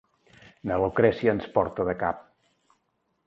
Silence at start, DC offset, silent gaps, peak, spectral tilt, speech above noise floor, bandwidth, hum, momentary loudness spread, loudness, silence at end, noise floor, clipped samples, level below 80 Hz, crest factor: 0.65 s; under 0.1%; none; -6 dBFS; -8.5 dB/octave; 49 dB; 6 kHz; none; 10 LU; -26 LUFS; 1.05 s; -74 dBFS; under 0.1%; -52 dBFS; 22 dB